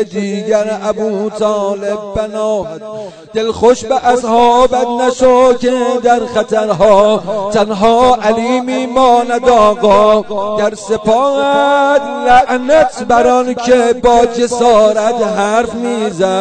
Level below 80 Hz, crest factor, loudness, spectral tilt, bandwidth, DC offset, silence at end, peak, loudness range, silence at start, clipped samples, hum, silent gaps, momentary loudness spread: -38 dBFS; 10 dB; -11 LUFS; -4.5 dB/octave; 9.4 kHz; under 0.1%; 0 s; 0 dBFS; 4 LU; 0 s; under 0.1%; none; none; 8 LU